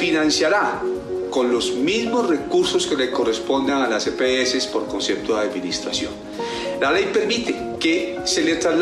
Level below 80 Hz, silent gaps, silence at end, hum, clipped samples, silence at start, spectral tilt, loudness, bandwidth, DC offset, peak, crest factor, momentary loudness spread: -52 dBFS; none; 0 s; none; under 0.1%; 0 s; -3 dB/octave; -20 LUFS; 12.5 kHz; under 0.1%; -8 dBFS; 12 dB; 7 LU